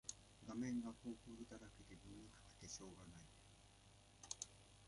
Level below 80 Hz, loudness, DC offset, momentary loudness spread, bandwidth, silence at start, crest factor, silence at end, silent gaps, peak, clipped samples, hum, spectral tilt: -72 dBFS; -54 LUFS; under 0.1%; 20 LU; 11.5 kHz; 0.05 s; 26 dB; 0 s; none; -30 dBFS; under 0.1%; none; -4 dB/octave